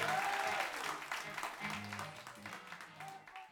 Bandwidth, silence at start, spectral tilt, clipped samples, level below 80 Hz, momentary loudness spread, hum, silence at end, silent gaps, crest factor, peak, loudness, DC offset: over 20 kHz; 0 s; -2.5 dB/octave; under 0.1%; -76 dBFS; 14 LU; none; 0 s; none; 22 dB; -20 dBFS; -41 LUFS; under 0.1%